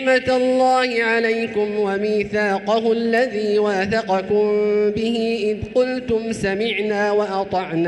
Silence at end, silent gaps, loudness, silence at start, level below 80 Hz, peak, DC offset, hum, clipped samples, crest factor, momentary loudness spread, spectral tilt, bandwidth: 0 s; none; -19 LUFS; 0 s; -50 dBFS; -6 dBFS; under 0.1%; none; under 0.1%; 14 dB; 5 LU; -5.5 dB/octave; 11 kHz